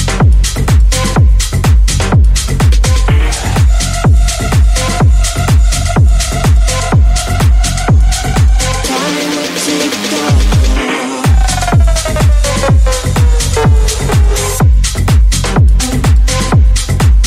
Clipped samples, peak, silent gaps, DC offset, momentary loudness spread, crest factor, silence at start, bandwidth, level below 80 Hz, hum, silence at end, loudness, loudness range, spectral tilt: under 0.1%; 0 dBFS; none; under 0.1%; 3 LU; 8 dB; 0 s; 15 kHz; -10 dBFS; none; 0 s; -11 LUFS; 1 LU; -4.5 dB/octave